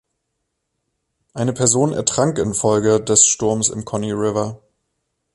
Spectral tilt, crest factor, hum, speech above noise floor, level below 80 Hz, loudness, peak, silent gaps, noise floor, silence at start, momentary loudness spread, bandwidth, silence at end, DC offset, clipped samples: -4 dB/octave; 20 dB; none; 57 dB; -50 dBFS; -17 LUFS; 0 dBFS; none; -75 dBFS; 1.35 s; 12 LU; 11.5 kHz; 0.8 s; under 0.1%; under 0.1%